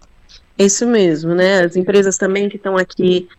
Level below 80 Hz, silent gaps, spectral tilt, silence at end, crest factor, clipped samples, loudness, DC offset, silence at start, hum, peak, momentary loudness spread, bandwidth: -52 dBFS; none; -4.5 dB/octave; 0.1 s; 12 dB; under 0.1%; -14 LUFS; under 0.1%; 0.6 s; none; -2 dBFS; 5 LU; 9.4 kHz